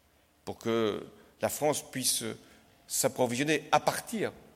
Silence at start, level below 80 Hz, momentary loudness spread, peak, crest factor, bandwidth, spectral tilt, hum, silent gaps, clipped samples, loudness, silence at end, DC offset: 0.45 s; -68 dBFS; 13 LU; -12 dBFS; 20 dB; 16.5 kHz; -3 dB/octave; none; none; under 0.1%; -30 LUFS; 0.15 s; under 0.1%